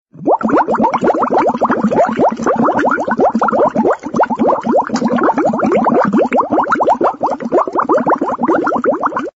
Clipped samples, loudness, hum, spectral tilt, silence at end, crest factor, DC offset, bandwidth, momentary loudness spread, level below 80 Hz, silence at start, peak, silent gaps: under 0.1%; -13 LUFS; none; -7 dB/octave; 0.05 s; 10 dB; under 0.1%; 8 kHz; 3 LU; -52 dBFS; 0.15 s; -4 dBFS; none